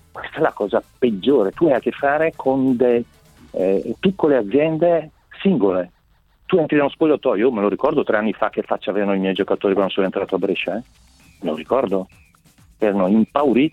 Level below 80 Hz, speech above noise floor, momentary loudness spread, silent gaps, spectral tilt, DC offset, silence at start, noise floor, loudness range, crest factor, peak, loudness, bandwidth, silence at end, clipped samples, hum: -54 dBFS; 39 dB; 9 LU; none; -8 dB/octave; under 0.1%; 0.15 s; -57 dBFS; 3 LU; 18 dB; -2 dBFS; -19 LUFS; 9.6 kHz; 0.05 s; under 0.1%; none